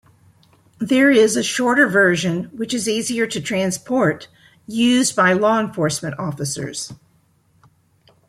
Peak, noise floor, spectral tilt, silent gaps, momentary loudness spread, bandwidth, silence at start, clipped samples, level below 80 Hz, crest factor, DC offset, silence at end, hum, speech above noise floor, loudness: -2 dBFS; -59 dBFS; -4 dB/octave; none; 12 LU; 15 kHz; 0.8 s; under 0.1%; -60 dBFS; 18 dB; under 0.1%; 1.35 s; none; 41 dB; -18 LUFS